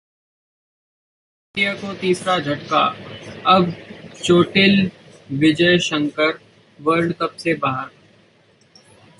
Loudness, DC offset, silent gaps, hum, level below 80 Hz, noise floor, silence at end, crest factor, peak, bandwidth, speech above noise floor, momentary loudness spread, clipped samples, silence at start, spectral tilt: -18 LUFS; under 0.1%; none; none; -56 dBFS; -55 dBFS; 1.3 s; 18 dB; -2 dBFS; 11.5 kHz; 37 dB; 15 LU; under 0.1%; 1.55 s; -5 dB/octave